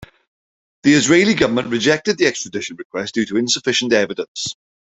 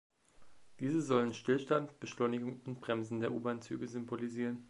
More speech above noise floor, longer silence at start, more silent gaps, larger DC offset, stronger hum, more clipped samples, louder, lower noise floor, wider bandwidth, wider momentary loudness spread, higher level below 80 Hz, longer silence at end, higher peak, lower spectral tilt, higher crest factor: first, over 73 dB vs 23 dB; first, 0.85 s vs 0.4 s; first, 2.85-2.90 s, 4.28-4.35 s vs none; neither; neither; neither; first, -17 LUFS vs -37 LUFS; first, under -90 dBFS vs -60 dBFS; second, 8.4 kHz vs 11.5 kHz; first, 13 LU vs 9 LU; first, -54 dBFS vs -76 dBFS; first, 0.35 s vs 0 s; first, 0 dBFS vs -18 dBFS; second, -3.5 dB/octave vs -6.5 dB/octave; about the same, 18 dB vs 20 dB